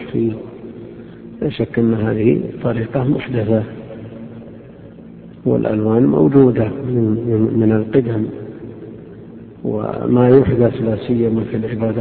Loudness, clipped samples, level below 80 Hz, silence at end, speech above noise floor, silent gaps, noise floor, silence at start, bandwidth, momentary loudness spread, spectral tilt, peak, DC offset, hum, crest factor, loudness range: -16 LUFS; under 0.1%; -46 dBFS; 0 s; 22 dB; none; -37 dBFS; 0 s; 4.4 kHz; 24 LU; -13 dB/octave; 0 dBFS; under 0.1%; none; 16 dB; 5 LU